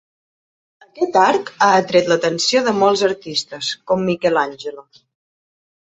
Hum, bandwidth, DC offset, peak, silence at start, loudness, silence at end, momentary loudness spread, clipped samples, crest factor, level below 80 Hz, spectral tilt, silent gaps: none; 8.2 kHz; under 0.1%; -2 dBFS; 0.95 s; -17 LUFS; 1.1 s; 9 LU; under 0.1%; 18 dB; -62 dBFS; -3.5 dB/octave; none